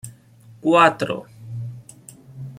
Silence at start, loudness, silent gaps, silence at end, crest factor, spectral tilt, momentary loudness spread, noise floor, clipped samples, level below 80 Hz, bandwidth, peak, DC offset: 0.05 s; -18 LUFS; none; 0 s; 20 dB; -5.5 dB/octave; 24 LU; -48 dBFS; under 0.1%; -62 dBFS; 16 kHz; -2 dBFS; under 0.1%